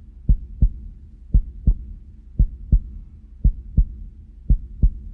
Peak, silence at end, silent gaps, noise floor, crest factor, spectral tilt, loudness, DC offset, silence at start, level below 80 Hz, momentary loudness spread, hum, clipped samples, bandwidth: -6 dBFS; 0 s; none; -39 dBFS; 16 dB; -13.5 dB/octave; -25 LUFS; under 0.1%; 0.3 s; -22 dBFS; 20 LU; none; under 0.1%; 0.7 kHz